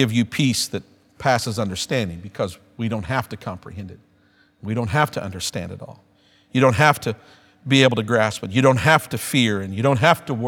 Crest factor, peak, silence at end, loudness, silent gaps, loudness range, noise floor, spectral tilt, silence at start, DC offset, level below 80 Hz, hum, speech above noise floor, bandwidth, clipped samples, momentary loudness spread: 22 dB; 0 dBFS; 0 s; -20 LUFS; none; 9 LU; -58 dBFS; -5 dB/octave; 0 s; under 0.1%; -52 dBFS; none; 38 dB; 18 kHz; under 0.1%; 17 LU